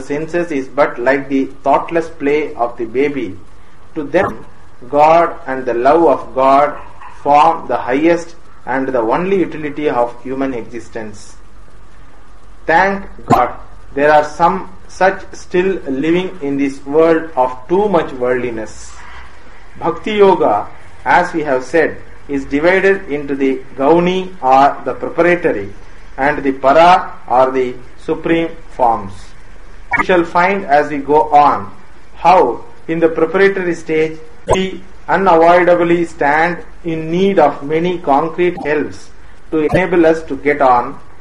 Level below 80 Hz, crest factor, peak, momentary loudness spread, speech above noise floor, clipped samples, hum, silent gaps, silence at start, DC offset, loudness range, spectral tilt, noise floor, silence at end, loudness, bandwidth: -40 dBFS; 14 dB; 0 dBFS; 14 LU; 27 dB; under 0.1%; none; none; 0 s; 4%; 5 LU; -6 dB/octave; -41 dBFS; 0.2 s; -14 LUFS; 11.5 kHz